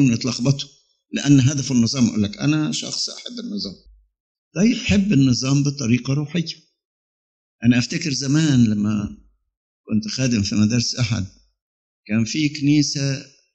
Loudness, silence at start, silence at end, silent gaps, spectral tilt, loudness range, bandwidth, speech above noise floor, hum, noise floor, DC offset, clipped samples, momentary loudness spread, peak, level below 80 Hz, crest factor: -20 LUFS; 0 s; 0.3 s; 4.20-4.51 s, 6.85-7.59 s, 9.57-9.84 s, 11.62-12.03 s; -5 dB/octave; 2 LU; 8.6 kHz; over 71 dB; none; under -90 dBFS; under 0.1%; under 0.1%; 12 LU; -2 dBFS; -50 dBFS; 18 dB